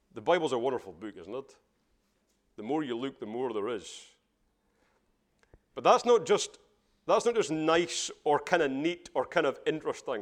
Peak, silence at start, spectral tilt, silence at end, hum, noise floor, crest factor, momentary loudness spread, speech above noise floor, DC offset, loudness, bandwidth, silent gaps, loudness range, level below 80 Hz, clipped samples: -10 dBFS; 0.15 s; -3.5 dB/octave; 0 s; none; -74 dBFS; 22 dB; 17 LU; 45 dB; under 0.1%; -29 LUFS; 11 kHz; none; 10 LU; -70 dBFS; under 0.1%